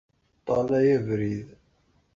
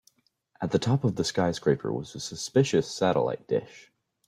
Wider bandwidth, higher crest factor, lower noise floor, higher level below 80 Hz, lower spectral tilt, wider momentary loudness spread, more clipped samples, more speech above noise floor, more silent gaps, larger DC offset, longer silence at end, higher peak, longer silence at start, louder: second, 7.4 kHz vs 14.5 kHz; about the same, 16 dB vs 20 dB; about the same, -66 dBFS vs -68 dBFS; about the same, -58 dBFS vs -60 dBFS; first, -8.5 dB/octave vs -5.5 dB/octave; first, 13 LU vs 9 LU; neither; about the same, 42 dB vs 41 dB; neither; neither; first, 0.7 s vs 0.45 s; second, -12 dBFS vs -8 dBFS; second, 0.45 s vs 0.6 s; about the same, -25 LUFS vs -27 LUFS